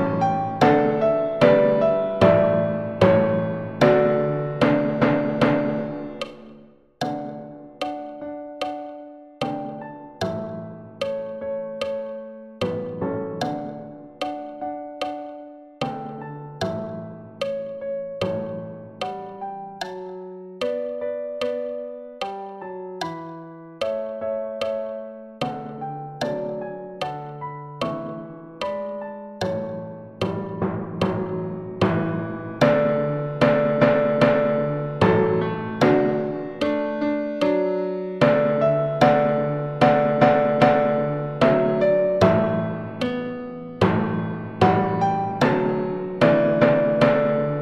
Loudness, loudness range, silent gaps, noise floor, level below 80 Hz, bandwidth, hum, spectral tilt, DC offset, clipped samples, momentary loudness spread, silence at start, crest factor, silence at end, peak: -22 LUFS; 12 LU; none; -49 dBFS; -54 dBFS; 10.5 kHz; none; -7.5 dB/octave; under 0.1%; under 0.1%; 17 LU; 0 s; 20 dB; 0 s; -2 dBFS